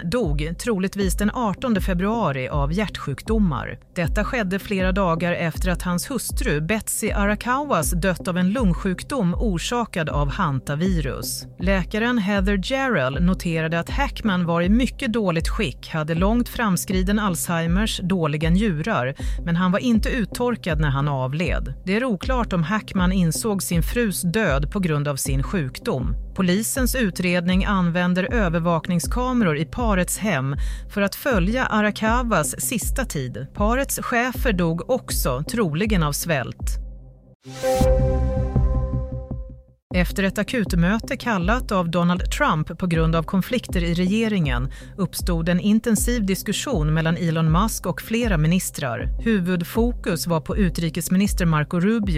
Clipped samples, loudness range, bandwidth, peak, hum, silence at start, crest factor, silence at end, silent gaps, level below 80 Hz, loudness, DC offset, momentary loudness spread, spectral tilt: under 0.1%; 2 LU; 16 kHz; -6 dBFS; none; 0 s; 14 dB; 0 s; 37.35-37.40 s, 39.82-39.90 s; -30 dBFS; -22 LUFS; under 0.1%; 5 LU; -5.5 dB/octave